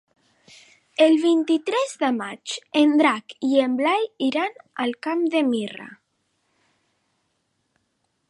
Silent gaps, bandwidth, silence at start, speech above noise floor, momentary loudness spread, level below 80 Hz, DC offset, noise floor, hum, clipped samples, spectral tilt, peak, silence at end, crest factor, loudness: none; 11 kHz; 1 s; 51 dB; 13 LU; -80 dBFS; under 0.1%; -72 dBFS; none; under 0.1%; -4 dB/octave; -6 dBFS; 2.35 s; 18 dB; -22 LUFS